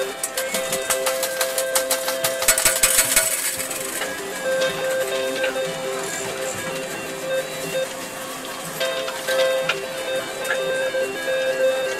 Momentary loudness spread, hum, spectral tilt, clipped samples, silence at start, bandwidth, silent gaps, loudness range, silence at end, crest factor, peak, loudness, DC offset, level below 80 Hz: 11 LU; none; -0.5 dB/octave; under 0.1%; 0 s; 16 kHz; none; 7 LU; 0 s; 22 dB; -2 dBFS; -22 LUFS; under 0.1%; -52 dBFS